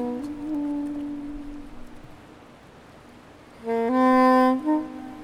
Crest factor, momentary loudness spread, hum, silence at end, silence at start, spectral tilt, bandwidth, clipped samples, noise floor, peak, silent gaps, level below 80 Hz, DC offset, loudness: 16 dB; 22 LU; none; 0 s; 0 s; -6 dB/octave; 13 kHz; under 0.1%; -48 dBFS; -8 dBFS; none; -50 dBFS; under 0.1%; -23 LUFS